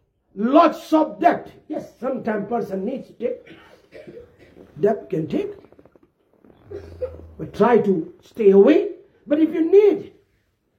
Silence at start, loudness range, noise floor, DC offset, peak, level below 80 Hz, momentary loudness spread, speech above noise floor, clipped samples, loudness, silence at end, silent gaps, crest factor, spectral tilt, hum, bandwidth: 0.35 s; 11 LU; -66 dBFS; under 0.1%; -2 dBFS; -60 dBFS; 20 LU; 47 dB; under 0.1%; -19 LUFS; 0.7 s; none; 18 dB; -8 dB/octave; none; 7.2 kHz